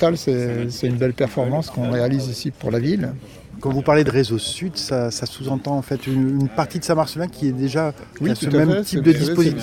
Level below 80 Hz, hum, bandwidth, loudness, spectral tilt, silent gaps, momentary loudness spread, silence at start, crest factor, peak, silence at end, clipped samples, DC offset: -48 dBFS; none; 17 kHz; -21 LUFS; -6 dB/octave; none; 9 LU; 0 s; 18 dB; -2 dBFS; 0 s; under 0.1%; under 0.1%